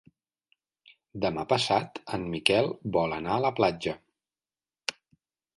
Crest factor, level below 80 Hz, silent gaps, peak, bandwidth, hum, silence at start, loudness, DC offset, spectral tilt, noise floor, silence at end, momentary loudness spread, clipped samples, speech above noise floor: 26 dB; -60 dBFS; none; -4 dBFS; 11.5 kHz; none; 1.15 s; -28 LUFS; under 0.1%; -4.5 dB/octave; under -90 dBFS; 0.65 s; 12 LU; under 0.1%; over 63 dB